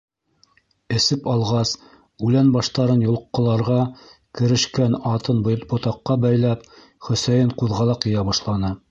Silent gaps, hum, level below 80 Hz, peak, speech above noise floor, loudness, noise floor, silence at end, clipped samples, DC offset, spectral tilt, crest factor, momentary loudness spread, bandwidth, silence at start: none; none; -46 dBFS; -6 dBFS; 41 dB; -20 LUFS; -60 dBFS; 0.15 s; under 0.1%; under 0.1%; -6 dB/octave; 16 dB; 7 LU; 7.8 kHz; 0.9 s